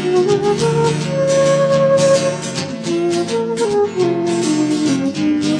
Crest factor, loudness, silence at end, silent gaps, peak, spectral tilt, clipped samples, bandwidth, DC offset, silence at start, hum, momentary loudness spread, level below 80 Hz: 12 dB; -16 LUFS; 0 s; none; -4 dBFS; -5.5 dB/octave; under 0.1%; 10.5 kHz; under 0.1%; 0 s; none; 6 LU; -52 dBFS